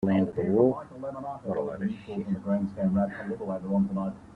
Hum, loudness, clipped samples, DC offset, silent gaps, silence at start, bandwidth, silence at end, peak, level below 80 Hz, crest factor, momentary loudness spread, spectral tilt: none; -29 LUFS; under 0.1%; under 0.1%; none; 0 s; 4.5 kHz; 0 s; -10 dBFS; -60 dBFS; 18 dB; 11 LU; -10 dB/octave